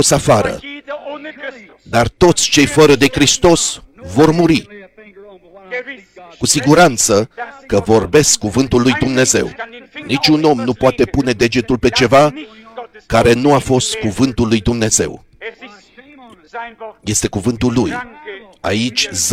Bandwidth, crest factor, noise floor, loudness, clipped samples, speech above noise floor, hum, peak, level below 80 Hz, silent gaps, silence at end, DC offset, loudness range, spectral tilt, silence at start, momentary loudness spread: 16.5 kHz; 14 dB; -41 dBFS; -13 LUFS; under 0.1%; 28 dB; none; 0 dBFS; -36 dBFS; none; 0 s; under 0.1%; 7 LU; -4 dB/octave; 0 s; 20 LU